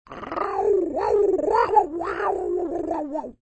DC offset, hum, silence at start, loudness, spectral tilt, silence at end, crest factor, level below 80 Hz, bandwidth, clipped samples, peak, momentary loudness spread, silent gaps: under 0.1%; none; 0.1 s; -23 LUFS; -6.5 dB/octave; 0.1 s; 18 dB; -52 dBFS; 8.4 kHz; under 0.1%; -6 dBFS; 9 LU; none